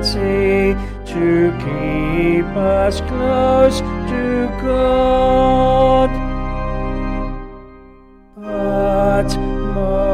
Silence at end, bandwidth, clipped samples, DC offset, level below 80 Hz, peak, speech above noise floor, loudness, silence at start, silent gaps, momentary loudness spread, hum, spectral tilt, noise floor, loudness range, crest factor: 0 s; 13.5 kHz; under 0.1%; under 0.1%; -26 dBFS; -2 dBFS; 29 dB; -16 LUFS; 0 s; none; 11 LU; none; -6.5 dB/octave; -43 dBFS; 6 LU; 14 dB